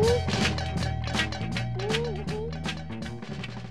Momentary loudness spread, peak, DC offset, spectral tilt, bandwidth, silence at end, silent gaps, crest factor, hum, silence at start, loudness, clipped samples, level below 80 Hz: 11 LU; -12 dBFS; 0.6%; -5 dB/octave; 13.5 kHz; 0 s; none; 16 dB; none; 0 s; -30 LUFS; under 0.1%; -40 dBFS